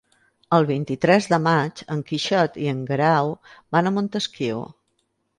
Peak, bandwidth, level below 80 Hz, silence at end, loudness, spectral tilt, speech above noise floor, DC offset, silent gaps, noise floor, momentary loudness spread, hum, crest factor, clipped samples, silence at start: -4 dBFS; 11 kHz; -64 dBFS; 0.75 s; -22 LUFS; -6 dB/octave; 50 dB; under 0.1%; none; -71 dBFS; 9 LU; none; 20 dB; under 0.1%; 0.5 s